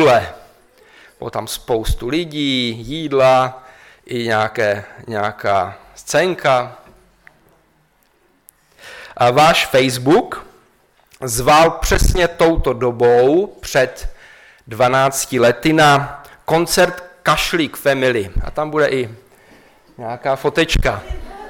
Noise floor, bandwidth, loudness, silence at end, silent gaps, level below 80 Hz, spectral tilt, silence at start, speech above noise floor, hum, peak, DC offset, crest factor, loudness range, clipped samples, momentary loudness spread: -58 dBFS; 17.5 kHz; -16 LUFS; 0 s; none; -30 dBFS; -4.5 dB/octave; 0 s; 42 dB; none; -2 dBFS; under 0.1%; 16 dB; 6 LU; under 0.1%; 17 LU